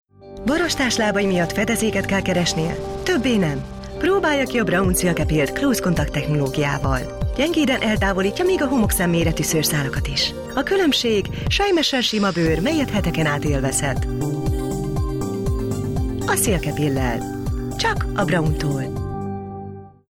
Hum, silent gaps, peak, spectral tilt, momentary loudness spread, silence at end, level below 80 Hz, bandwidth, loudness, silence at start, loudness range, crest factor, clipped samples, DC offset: none; none; -8 dBFS; -4.5 dB/octave; 7 LU; 0.2 s; -32 dBFS; 17 kHz; -20 LUFS; 0.2 s; 3 LU; 12 dB; under 0.1%; under 0.1%